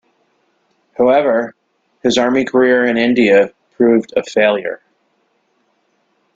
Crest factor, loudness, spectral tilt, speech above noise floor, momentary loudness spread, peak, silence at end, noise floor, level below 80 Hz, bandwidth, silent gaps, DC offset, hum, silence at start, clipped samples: 14 dB; -14 LUFS; -5 dB/octave; 50 dB; 10 LU; -2 dBFS; 1.6 s; -62 dBFS; -58 dBFS; 7.8 kHz; none; under 0.1%; none; 1 s; under 0.1%